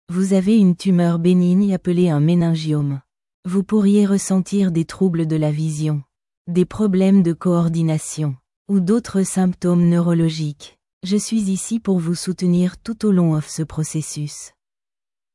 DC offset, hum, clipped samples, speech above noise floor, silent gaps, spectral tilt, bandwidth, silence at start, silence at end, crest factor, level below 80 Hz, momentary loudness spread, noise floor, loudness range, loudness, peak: under 0.1%; none; under 0.1%; over 73 dB; 3.34-3.43 s, 6.37-6.45 s, 8.56-8.65 s, 10.93-11.01 s; -7 dB/octave; 12 kHz; 0.1 s; 0.85 s; 12 dB; -52 dBFS; 11 LU; under -90 dBFS; 3 LU; -18 LUFS; -6 dBFS